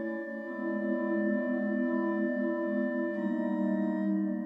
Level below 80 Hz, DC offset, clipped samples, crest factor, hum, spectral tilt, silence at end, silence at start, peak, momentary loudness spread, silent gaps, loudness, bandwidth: -82 dBFS; under 0.1%; under 0.1%; 12 dB; none; -10 dB/octave; 0 s; 0 s; -18 dBFS; 4 LU; none; -31 LUFS; 4 kHz